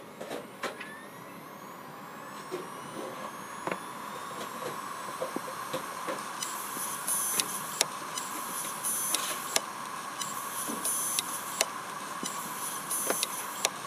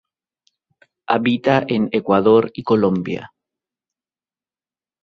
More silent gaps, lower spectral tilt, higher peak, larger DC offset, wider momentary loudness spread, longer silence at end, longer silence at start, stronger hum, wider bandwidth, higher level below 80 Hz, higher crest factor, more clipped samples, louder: neither; second, -1 dB/octave vs -8 dB/octave; about the same, -2 dBFS vs 0 dBFS; neither; first, 14 LU vs 9 LU; second, 0 s vs 1.8 s; second, 0 s vs 1.1 s; neither; first, 15.5 kHz vs 6.4 kHz; second, -82 dBFS vs -58 dBFS; first, 34 dB vs 20 dB; neither; second, -33 LUFS vs -17 LUFS